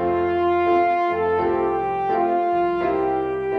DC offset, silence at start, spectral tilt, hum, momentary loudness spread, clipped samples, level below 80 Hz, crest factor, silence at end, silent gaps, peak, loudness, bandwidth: under 0.1%; 0 s; -8 dB/octave; none; 4 LU; under 0.1%; -50 dBFS; 10 dB; 0 s; none; -10 dBFS; -21 LUFS; 5.4 kHz